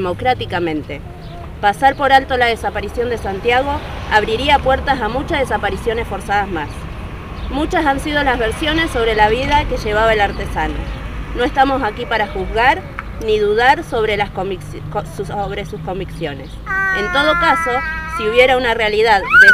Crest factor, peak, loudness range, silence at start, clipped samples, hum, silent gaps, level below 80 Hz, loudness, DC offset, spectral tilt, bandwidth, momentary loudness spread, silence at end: 16 dB; 0 dBFS; 4 LU; 0 s; under 0.1%; none; none; -30 dBFS; -16 LUFS; 0.4%; -5 dB/octave; 16 kHz; 13 LU; 0 s